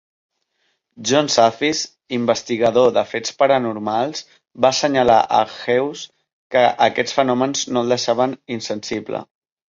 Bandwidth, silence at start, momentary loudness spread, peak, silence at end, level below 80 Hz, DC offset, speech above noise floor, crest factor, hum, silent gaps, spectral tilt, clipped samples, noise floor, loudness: 7.8 kHz; 1 s; 11 LU; -2 dBFS; 0.45 s; -58 dBFS; under 0.1%; 51 dB; 18 dB; none; 6.33-6.50 s; -3.5 dB/octave; under 0.1%; -69 dBFS; -18 LUFS